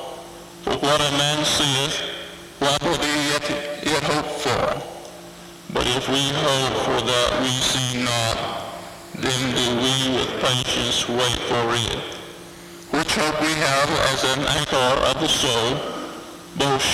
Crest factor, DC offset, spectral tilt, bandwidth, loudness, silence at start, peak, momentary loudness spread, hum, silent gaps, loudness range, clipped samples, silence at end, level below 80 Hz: 16 dB; under 0.1%; -3 dB/octave; 16.5 kHz; -20 LUFS; 0 s; -6 dBFS; 17 LU; none; none; 3 LU; under 0.1%; 0 s; -44 dBFS